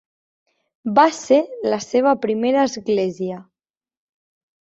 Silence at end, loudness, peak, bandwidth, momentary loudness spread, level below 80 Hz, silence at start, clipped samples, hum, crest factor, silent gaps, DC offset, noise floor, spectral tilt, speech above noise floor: 1.25 s; -19 LUFS; -2 dBFS; 8.2 kHz; 13 LU; -64 dBFS; 0.85 s; under 0.1%; none; 18 dB; none; under 0.1%; under -90 dBFS; -5 dB/octave; over 72 dB